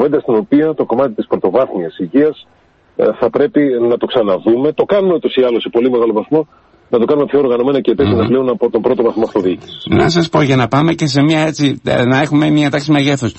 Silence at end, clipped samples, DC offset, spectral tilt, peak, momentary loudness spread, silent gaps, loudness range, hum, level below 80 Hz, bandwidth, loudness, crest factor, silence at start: 0.05 s; under 0.1%; under 0.1%; -6.5 dB/octave; -2 dBFS; 4 LU; none; 2 LU; none; -42 dBFS; 8.4 kHz; -13 LUFS; 12 dB; 0 s